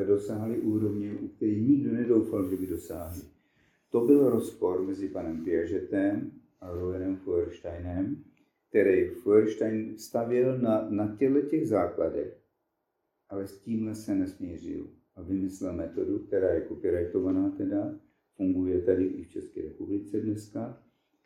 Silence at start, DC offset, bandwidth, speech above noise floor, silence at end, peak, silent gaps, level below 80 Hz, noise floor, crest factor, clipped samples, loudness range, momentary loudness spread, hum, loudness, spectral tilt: 0 s; under 0.1%; 19 kHz; 52 dB; 0.5 s; -10 dBFS; none; -58 dBFS; -80 dBFS; 20 dB; under 0.1%; 6 LU; 14 LU; none; -29 LUFS; -8.5 dB/octave